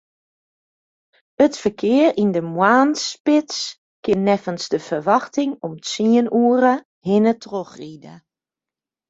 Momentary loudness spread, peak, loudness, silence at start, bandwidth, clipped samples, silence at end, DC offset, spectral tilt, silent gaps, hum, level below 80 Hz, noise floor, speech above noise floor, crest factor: 13 LU; -2 dBFS; -19 LUFS; 1.4 s; 8 kHz; under 0.1%; 0.9 s; under 0.1%; -5 dB/octave; 3.20-3.25 s, 3.78-4.03 s, 6.85-7.01 s; none; -60 dBFS; -89 dBFS; 71 dB; 18 dB